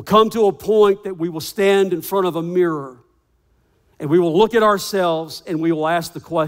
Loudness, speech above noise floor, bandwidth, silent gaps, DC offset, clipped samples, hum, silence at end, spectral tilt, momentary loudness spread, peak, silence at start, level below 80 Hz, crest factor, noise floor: -18 LUFS; 44 dB; 16.5 kHz; none; under 0.1%; under 0.1%; none; 0 s; -5.5 dB/octave; 10 LU; -2 dBFS; 0 s; -56 dBFS; 16 dB; -61 dBFS